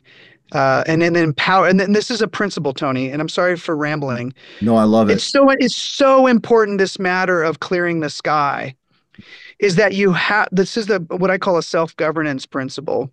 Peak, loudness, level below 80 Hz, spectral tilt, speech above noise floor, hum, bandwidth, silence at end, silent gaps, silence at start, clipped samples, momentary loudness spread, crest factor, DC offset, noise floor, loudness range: -2 dBFS; -16 LUFS; -58 dBFS; -5.5 dB/octave; 32 dB; none; 10.5 kHz; 0.05 s; none; 0.5 s; under 0.1%; 9 LU; 14 dB; under 0.1%; -48 dBFS; 4 LU